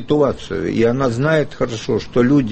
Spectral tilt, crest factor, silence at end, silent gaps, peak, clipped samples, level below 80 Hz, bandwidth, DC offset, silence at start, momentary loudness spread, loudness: -7 dB/octave; 14 dB; 0 s; none; -2 dBFS; under 0.1%; -40 dBFS; 8.6 kHz; under 0.1%; 0 s; 7 LU; -18 LUFS